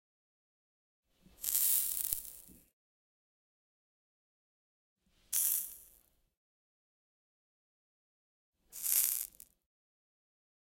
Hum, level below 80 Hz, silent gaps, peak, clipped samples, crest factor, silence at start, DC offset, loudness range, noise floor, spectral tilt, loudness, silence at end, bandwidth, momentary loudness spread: none; -70 dBFS; 2.73-4.96 s, 6.37-8.53 s; -8 dBFS; under 0.1%; 34 dB; 1.4 s; under 0.1%; 7 LU; -69 dBFS; 2 dB/octave; -32 LUFS; 1.4 s; 17 kHz; 17 LU